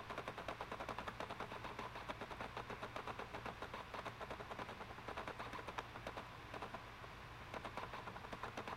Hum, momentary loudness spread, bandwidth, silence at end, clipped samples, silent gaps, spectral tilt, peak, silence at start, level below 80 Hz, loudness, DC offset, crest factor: none; 3 LU; 16 kHz; 0 s; under 0.1%; none; -4.5 dB/octave; -30 dBFS; 0 s; -64 dBFS; -49 LUFS; under 0.1%; 20 dB